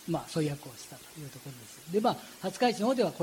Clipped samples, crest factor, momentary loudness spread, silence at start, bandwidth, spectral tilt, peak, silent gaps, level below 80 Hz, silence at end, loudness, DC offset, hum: under 0.1%; 18 dB; 17 LU; 0 s; 17 kHz; -5 dB/octave; -14 dBFS; none; -68 dBFS; 0 s; -31 LUFS; under 0.1%; none